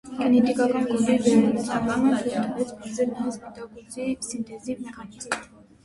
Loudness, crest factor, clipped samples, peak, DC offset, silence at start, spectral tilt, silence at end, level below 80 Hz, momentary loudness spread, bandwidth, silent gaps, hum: -24 LUFS; 18 dB; under 0.1%; -6 dBFS; under 0.1%; 0.05 s; -5 dB/octave; 0.4 s; -58 dBFS; 17 LU; 11.5 kHz; none; none